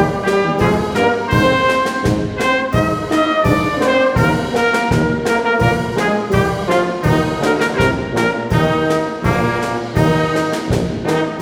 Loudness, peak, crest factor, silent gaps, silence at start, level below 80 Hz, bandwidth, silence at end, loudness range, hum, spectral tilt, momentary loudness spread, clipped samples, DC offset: -16 LUFS; 0 dBFS; 14 dB; none; 0 s; -34 dBFS; 20 kHz; 0 s; 1 LU; none; -6 dB/octave; 4 LU; under 0.1%; under 0.1%